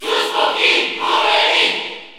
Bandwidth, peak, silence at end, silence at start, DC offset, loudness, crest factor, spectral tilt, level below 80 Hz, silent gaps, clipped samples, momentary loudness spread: 17 kHz; -2 dBFS; 0 s; 0 s; under 0.1%; -14 LUFS; 14 dB; -0.5 dB/octave; -64 dBFS; none; under 0.1%; 5 LU